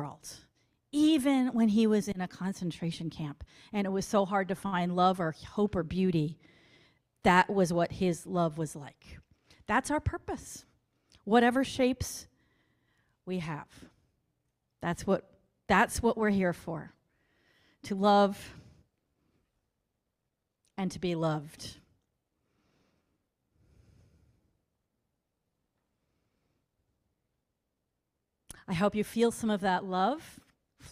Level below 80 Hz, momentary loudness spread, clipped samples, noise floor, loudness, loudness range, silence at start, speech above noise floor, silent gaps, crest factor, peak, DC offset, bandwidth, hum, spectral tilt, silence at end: -58 dBFS; 19 LU; under 0.1%; -84 dBFS; -30 LUFS; 9 LU; 0 s; 54 dB; none; 22 dB; -10 dBFS; under 0.1%; 15.5 kHz; none; -5.5 dB/octave; 0 s